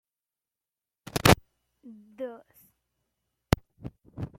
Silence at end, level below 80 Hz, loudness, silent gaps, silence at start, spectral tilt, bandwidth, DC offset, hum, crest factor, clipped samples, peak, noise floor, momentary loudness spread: 0.1 s; -46 dBFS; -25 LUFS; none; 1.15 s; -4.5 dB/octave; 16.5 kHz; under 0.1%; none; 30 dB; under 0.1%; -2 dBFS; under -90 dBFS; 23 LU